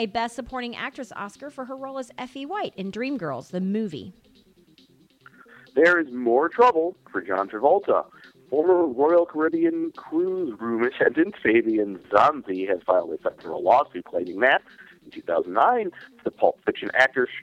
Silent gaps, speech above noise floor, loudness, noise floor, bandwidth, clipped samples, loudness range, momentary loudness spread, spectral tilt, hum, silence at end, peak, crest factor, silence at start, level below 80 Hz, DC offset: none; 34 dB; -23 LUFS; -57 dBFS; 10 kHz; under 0.1%; 10 LU; 14 LU; -6 dB/octave; none; 0 s; -2 dBFS; 22 dB; 0 s; -64 dBFS; under 0.1%